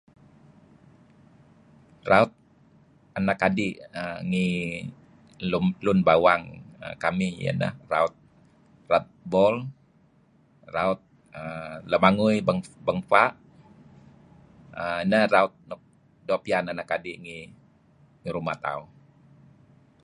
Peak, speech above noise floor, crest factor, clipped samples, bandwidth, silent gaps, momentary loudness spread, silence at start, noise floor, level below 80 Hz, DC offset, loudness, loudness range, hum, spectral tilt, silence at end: -2 dBFS; 36 dB; 26 dB; under 0.1%; 10.5 kHz; none; 20 LU; 2.05 s; -61 dBFS; -58 dBFS; under 0.1%; -25 LUFS; 5 LU; none; -6.5 dB/octave; 1.2 s